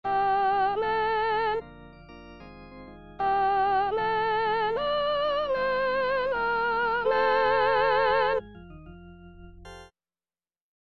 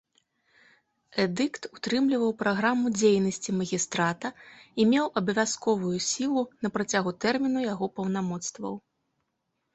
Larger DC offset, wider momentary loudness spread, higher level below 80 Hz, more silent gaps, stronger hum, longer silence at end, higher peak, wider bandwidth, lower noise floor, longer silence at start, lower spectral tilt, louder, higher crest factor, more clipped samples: first, 0.2% vs under 0.1%; first, 23 LU vs 11 LU; first, -54 dBFS vs -66 dBFS; neither; neither; about the same, 1 s vs 0.95 s; about the same, -12 dBFS vs -10 dBFS; second, 6.4 kHz vs 8.4 kHz; first, under -90 dBFS vs -79 dBFS; second, 0.05 s vs 1.15 s; about the same, -5.5 dB/octave vs -4.5 dB/octave; about the same, -25 LUFS vs -27 LUFS; about the same, 16 dB vs 18 dB; neither